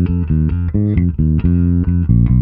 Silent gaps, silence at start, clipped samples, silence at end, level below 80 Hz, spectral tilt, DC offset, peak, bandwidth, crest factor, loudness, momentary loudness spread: none; 0 s; under 0.1%; 0 s; -20 dBFS; -13.5 dB/octave; under 0.1%; 0 dBFS; 3.2 kHz; 12 dB; -15 LUFS; 3 LU